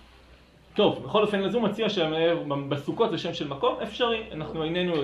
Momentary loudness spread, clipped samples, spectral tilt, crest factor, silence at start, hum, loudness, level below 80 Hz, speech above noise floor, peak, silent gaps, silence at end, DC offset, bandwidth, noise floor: 7 LU; under 0.1%; -6.5 dB/octave; 20 dB; 0.3 s; none; -27 LUFS; -56 dBFS; 28 dB; -8 dBFS; none; 0 s; under 0.1%; 11 kHz; -54 dBFS